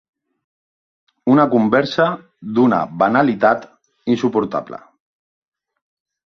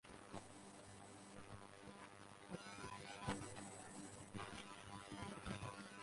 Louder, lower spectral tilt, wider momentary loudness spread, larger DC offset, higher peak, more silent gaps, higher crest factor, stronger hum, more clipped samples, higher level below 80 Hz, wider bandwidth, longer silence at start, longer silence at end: first, -17 LUFS vs -54 LUFS; first, -7.5 dB/octave vs -4 dB/octave; first, 13 LU vs 10 LU; neither; first, -2 dBFS vs -30 dBFS; neither; second, 18 dB vs 24 dB; neither; neither; first, -60 dBFS vs -70 dBFS; second, 6.4 kHz vs 11.5 kHz; first, 1.25 s vs 0.05 s; first, 1.5 s vs 0 s